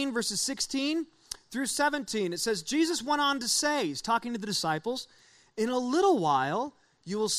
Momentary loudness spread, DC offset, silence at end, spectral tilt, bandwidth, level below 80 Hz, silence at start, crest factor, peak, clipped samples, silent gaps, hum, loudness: 12 LU; under 0.1%; 0 s; -2.5 dB/octave; 15.5 kHz; -66 dBFS; 0 s; 18 dB; -12 dBFS; under 0.1%; none; none; -29 LUFS